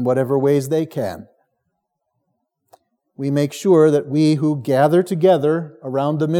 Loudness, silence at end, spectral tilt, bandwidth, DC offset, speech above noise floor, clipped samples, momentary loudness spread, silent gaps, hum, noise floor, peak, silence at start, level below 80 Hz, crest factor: -18 LUFS; 0 s; -7.5 dB/octave; 16.5 kHz; under 0.1%; 57 dB; under 0.1%; 11 LU; none; none; -74 dBFS; -2 dBFS; 0 s; -72 dBFS; 16 dB